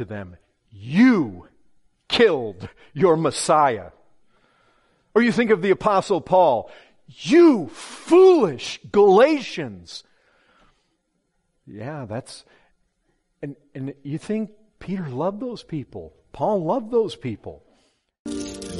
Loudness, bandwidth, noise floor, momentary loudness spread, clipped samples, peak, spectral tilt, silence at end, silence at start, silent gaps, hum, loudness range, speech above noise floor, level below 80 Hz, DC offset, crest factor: -19 LUFS; 11.5 kHz; -71 dBFS; 23 LU; under 0.1%; -4 dBFS; -5.5 dB/octave; 0 s; 0 s; 18.19-18.25 s; none; 19 LU; 51 dB; -58 dBFS; under 0.1%; 18 dB